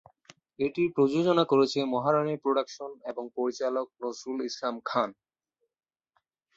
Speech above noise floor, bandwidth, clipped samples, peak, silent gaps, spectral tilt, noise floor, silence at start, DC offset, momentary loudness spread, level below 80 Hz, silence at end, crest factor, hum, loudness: 54 dB; 7.8 kHz; under 0.1%; -10 dBFS; none; -6 dB/octave; -81 dBFS; 0.6 s; under 0.1%; 13 LU; -72 dBFS; 1.45 s; 20 dB; none; -28 LUFS